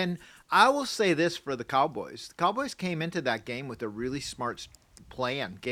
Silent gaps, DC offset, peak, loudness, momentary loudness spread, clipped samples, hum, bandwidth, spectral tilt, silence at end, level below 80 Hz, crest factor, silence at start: none; under 0.1%; -8 dBFS; -29 LUFS; 15 LU; under 0.1%; none; 16 kHz; -4.5 dB/octave; 0 s; -62 dBFS; 20 dB; 0 s